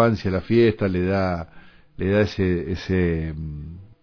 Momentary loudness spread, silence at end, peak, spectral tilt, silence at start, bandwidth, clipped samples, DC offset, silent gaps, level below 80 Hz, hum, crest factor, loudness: 15 LU; 0.15 s; -4 dBFS; -8.5 dB/octave; 0 s; 5.4 kHz; under 0.1%; under 0.1%; none; -40 dBFS; none; 18 dB; -22 LUFS